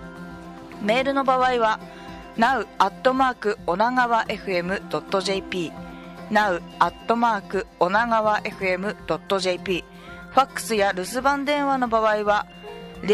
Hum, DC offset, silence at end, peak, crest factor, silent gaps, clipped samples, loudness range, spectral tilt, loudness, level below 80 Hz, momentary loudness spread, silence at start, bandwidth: none; under 0.1%; 0 s; -4 dBFS; 20 dB; none; under 0.1%; 2 LU; -4.5 dB/octave; -23 LUFS; -50 dBFS; 18 LU; 0 s; 15 kHz